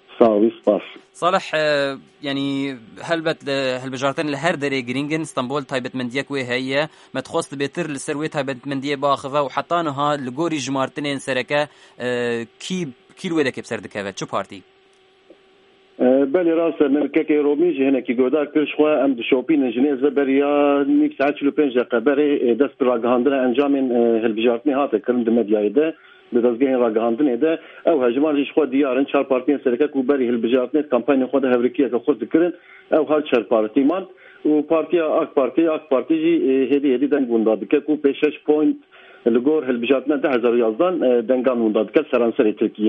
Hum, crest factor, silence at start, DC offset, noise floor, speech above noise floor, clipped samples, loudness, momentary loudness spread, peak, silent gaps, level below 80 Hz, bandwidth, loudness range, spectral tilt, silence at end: none; 18 dB; 0.1 s; under 0.1%; -55 dBFS; 36 dB; under 0.1%; -20 LUFS; 8 LU; 0 dBFS; none; -68 dBFS; 11.5 kHz; 6 LU; -5.5 dB/octave; 0 s